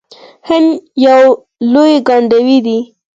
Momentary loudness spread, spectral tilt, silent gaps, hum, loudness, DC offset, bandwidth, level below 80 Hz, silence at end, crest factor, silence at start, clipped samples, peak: 8 LU; -5.5 dB/octave; none; none; -10 LUFS; under 0.1%; 7.8 kHz; -56 dBFS; 0.3 s; 10 dB; 0.45 s; under 0.1%; 0 dBFS